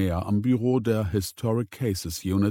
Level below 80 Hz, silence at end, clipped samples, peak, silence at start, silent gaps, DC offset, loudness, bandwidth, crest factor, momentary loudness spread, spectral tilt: -46 dBFS; 0 s; under 0.1%; -10 dBFS; 0 s; none; under 0.1%; -26 LUFS; 17.5 kHz; 14 dB; 5 LU; -6.5 dB/octave